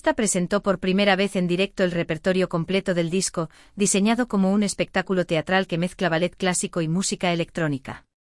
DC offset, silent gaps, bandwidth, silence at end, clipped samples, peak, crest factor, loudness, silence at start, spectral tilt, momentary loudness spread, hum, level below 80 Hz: under 0.1%; none; 12 kHz; 0.25 s; under 0.1%; -6 dBFS; 18 dB; -23 LUFS; 0.05 s; -4.5 dB/octave; 6 LU; none; -52 dBFS